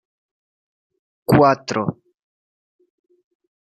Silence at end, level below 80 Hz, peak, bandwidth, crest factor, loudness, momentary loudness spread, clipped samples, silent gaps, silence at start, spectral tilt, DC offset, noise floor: 1.7 s; -54 dBFS; -2 dBFS; 12.5 kHz; 22 dB; -18 LUFS; 14 LU; under 0.1%; none; 1.3 s; -7 dB/octave; under 0.1%; under -90 dBFS